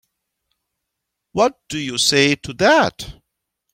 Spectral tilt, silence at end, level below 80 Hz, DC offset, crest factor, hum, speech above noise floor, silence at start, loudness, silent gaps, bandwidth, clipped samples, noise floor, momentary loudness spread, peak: -3 dB/octave; 0.6 s; -52 dBFS; under 0.1%; 18 dB; none; 62 dB; 1.35 s; -17 LUFS; none; 16.5 kHz; under 0.1%; -79 dBFS; 14 LU; -2 dBFS